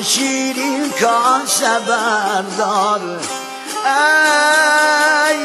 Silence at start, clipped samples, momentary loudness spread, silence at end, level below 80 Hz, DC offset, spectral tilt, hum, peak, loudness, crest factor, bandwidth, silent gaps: 0 s; under 0.1%; 9 LU; 0 s; -78 dBFS; under 0.1%; -1 dB/octave; none; 0 dBFS; -14 LUFS; 14 dB; 13 kHz; none